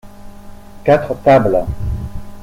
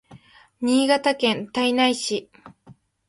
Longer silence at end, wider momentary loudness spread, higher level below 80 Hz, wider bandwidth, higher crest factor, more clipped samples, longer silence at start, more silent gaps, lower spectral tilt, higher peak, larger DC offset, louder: second, 0 s vs 0.35 s; first, 14 LU vs 9 LU; first, -30 dBFS vs -66 dBFS; first, 16 kHz vs 11.5 kHz; about the same, 16 dB vs 18 dB; neither; about the same, 0.05 s vs 0.1 s; neither; first, -8 dB/octave vs -3 dB/octave; first, 0 dBFS vs -4 dBFS; neither; first, -15 LUFS vs -21 LUFS